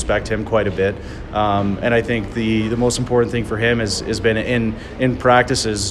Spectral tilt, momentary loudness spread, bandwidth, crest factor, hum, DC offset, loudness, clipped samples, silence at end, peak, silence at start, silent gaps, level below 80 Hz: -5 dB/octave; 7 LU; 13 kHz; 18 dB; none; under 0.1%; -18 LUFS; under 0.1%; 0 s; 0 dBFS; 0 s; none; -34 dBFS